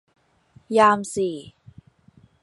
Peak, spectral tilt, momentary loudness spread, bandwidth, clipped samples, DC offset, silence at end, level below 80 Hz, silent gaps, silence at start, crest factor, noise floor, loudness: -4 dBFS; -4.5 dB/octave; 12 LU; 11.5 kHz; under 0.1%; under 0.1%; 0.95 s; -62 dBFS; none; 0.7 s; 22 dB; -56 dBFS; -20 LUFS